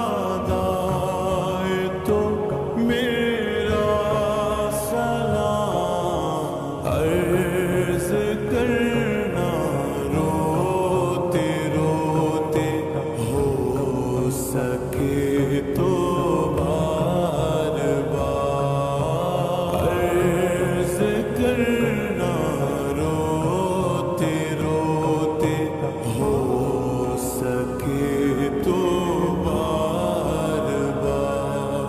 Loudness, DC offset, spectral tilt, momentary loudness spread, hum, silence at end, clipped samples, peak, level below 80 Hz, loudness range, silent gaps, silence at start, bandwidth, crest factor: -22 LUFS; under 0.1%; -6.5 dB/octave; 3 LU; none; 0 s; under 0.1%; -8 dBFS; -40 dBFS; 1 LU; none; 0 s; 14.5 kHz; 14 dB